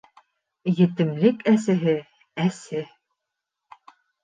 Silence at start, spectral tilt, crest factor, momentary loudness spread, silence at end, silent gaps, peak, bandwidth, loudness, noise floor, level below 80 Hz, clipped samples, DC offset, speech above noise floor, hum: 0.65 s; -7.5 dB/octave; 20 dB; 12 LU; 1.4 s; none; -4 dBFS; 9.6 kHz; -23 LUFS; -83 dBFS; -72 dBFS; under 0.1%; under 0.1%; 62 dB; none